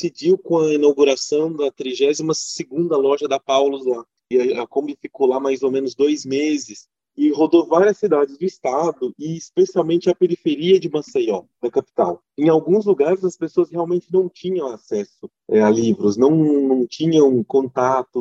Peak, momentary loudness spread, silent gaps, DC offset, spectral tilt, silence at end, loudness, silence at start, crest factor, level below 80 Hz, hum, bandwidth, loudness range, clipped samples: -2 dBFS; 9 LU; none; under 0.1%; -5.5 dB/octave; 0 s; -19 LUFS; 0 s; 16 dB; -68 dBFS; none; 8 kHz; 3 LU; under 0.1%